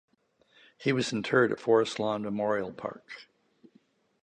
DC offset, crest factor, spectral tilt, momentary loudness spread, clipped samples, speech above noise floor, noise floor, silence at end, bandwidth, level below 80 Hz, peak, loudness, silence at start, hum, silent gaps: under 0.1%; 22 dB; -5.5 dB/octave; 17 LU; under 0.1%; 38 dB; -67 dBFS; 1 s; 9.8 kHz; -72 dBFS; -10 dBFS; -29 LUFS; 0.8 s; none; none